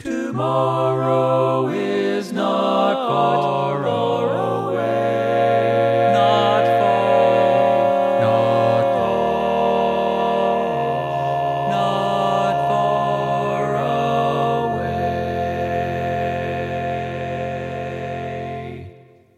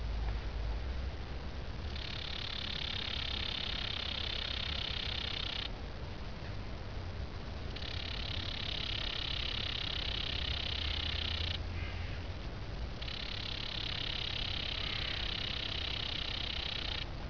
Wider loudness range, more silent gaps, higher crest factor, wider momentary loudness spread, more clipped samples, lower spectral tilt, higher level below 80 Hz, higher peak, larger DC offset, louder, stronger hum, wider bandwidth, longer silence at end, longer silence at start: first, 7 LU vs 4 LU; neither; about the same, 16 dB vs 16 dB; about the same, 9 LU vs 8 LU; neither; first, -7 dB/octave vs -4.5 dB/octave; second, -50 dBFS vs -44 dBFS; first, -2 dBFS vs -24 dBFS; second, under 0.1% vs 0.3%; first, -19 LUFS vs -37 LUFS; neither; first, 13 kHz vs 5.4 kHz; first, 0.45 s vs 0 s; about the same, 0 s vs 0 s